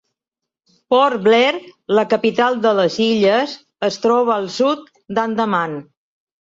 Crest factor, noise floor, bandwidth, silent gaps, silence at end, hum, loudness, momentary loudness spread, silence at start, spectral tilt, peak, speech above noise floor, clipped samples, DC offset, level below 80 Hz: 16 dB; -84 dBFS; 7.8 kHz; none; 0.65 s; none; -17 LUFS; 10 LU; 0.9 s; -5 dB/octave; -2 dBFS; 68 dB; under 0.1%; under 0.1%; -66 dBFS